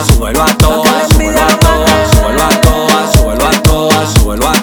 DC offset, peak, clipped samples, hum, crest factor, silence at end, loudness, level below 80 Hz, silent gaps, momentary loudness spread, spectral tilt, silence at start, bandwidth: under 0.1%; 0 dBFS; 0.6%; none; 8 dB; 0 s; -9 LUFS; -14 dBFS; none; 2 LU; -4.5 dB/octave; 0 s; over 20 kHz